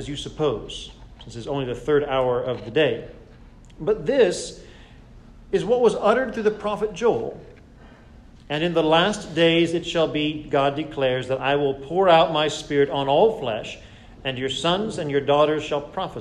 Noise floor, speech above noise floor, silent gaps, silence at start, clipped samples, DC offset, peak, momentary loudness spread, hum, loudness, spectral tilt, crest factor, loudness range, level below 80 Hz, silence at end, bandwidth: -47 dBFS; 25 dB; none; 0 s; under 0.1%; under 0.1%; -4 dBFS; 13 LU; none; -22 LUFS; -5 dB/octave; 18 dB; 4 LU; -48 dBFS; 0 s; 11 kHz